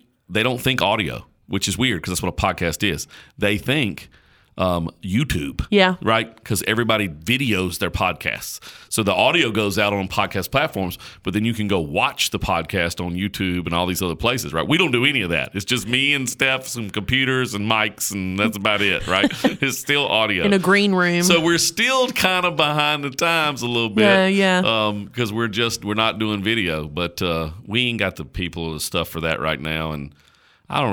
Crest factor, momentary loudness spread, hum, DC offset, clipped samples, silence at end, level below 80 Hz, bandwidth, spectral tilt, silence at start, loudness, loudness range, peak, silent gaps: 18 dB; 9 LU; none; under 0.1%; under 0.1%; 0 s; -42 dBFS; over 20 kHz; -4 dB/octave; 0.3 s; -20 LUFS; 5 LU; -2 dBFS; none